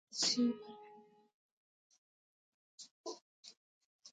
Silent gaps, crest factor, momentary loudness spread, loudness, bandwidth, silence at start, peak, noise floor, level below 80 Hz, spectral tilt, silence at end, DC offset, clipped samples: 1.34-1.90 s, 1.98-2.78 s, 2.91-3.04 s, 3.21-3.43 s, 3.57-3.99 s; 22 dB; 26 LU; -37 LUFS; 9 kHz; 0.1 s; -20 dBFS; -62 dBFS; under -90 dBFS; -2 dB/octave; 0.05 s; under 0.1%; under 0.1%